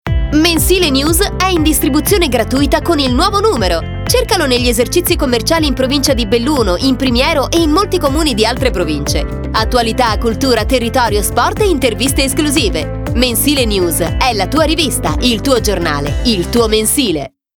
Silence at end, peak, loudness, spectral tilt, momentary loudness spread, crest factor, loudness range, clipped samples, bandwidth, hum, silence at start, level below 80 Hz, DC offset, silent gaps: 0.3 s; 0 dBFS; -12 LUFS; -4 dB/octave; 4 LU; 12 dB; 2 LU; under 0.1%; over 20 kHz; none; 0.05 s; -22 dBFS; under 0.1%; none